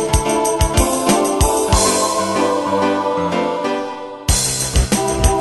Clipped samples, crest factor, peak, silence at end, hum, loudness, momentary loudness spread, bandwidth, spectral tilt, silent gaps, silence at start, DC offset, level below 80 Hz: under 0.1%; 16 dB; 0 dBFS; 0 s; none; -16 LUFS; 5 LU; 12.5 kHz; -4 dB/octave; none; 0 s; under 0.1%; -24 dBFS